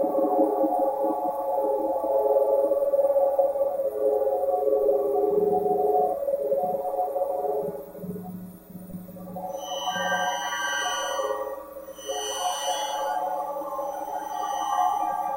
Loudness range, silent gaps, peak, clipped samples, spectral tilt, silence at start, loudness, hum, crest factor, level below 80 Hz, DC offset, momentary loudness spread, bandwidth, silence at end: 7 LU; none; -10 dBFS; under 0.1%; -3 dB/octave; 0 s; -26 LUFS; none; 16 dB; -62 dBFS; under 0.1%; 14 LU; 16 kHz; 0 s